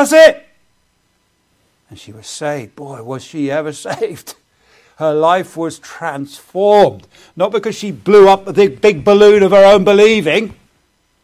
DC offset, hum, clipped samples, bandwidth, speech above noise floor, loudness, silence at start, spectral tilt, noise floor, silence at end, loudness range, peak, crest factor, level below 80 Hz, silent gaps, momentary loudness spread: under 0.1%; none; under 0.1%; 14.5 kHz; 49 dB; -11 LUFS; 0 s; -5 dB/octave; -61 dBFS; 0.75 s; 14 LU; 0 dBFS; 12 dB; -50 dBFS; none; 20 LU